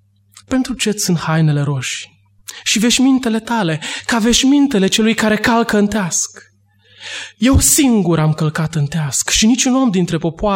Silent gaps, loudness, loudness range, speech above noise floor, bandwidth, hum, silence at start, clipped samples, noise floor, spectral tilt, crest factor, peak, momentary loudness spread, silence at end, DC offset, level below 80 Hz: none; -14 LUFS; 2 LU; 36 dB; 16.5 kHz; none; 0.5 s; under 0.1%; -50 dBFS; -4 dB/octave; 16 dB; 0 dBFS; 10 LU; 0 s; under 0.1%; -34 dBFS